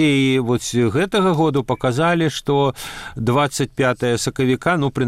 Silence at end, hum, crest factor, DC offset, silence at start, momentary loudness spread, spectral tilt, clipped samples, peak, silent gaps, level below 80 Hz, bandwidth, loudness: 0 s; none; 12 dB; under 0.1%; 0 s; 4 LU; -5.5 dB/octave; under 0.1%; -6 dBFS; none; -46 dBFS; 15.5 kHz; -18 LUFS